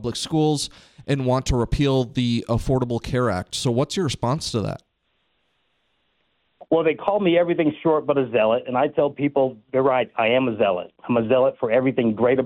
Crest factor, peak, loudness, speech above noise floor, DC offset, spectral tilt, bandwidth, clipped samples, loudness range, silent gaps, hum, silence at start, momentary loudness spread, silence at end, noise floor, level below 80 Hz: 16 dB; -4 dBFS; -22 LUFS; 49 dB; under 0.1%; -6 dB/octave; 14 kHz; under 0.1%; 6 LU; none; none; 0 s; 5 LU; 0 s; -70 dBFS; -40 dBFS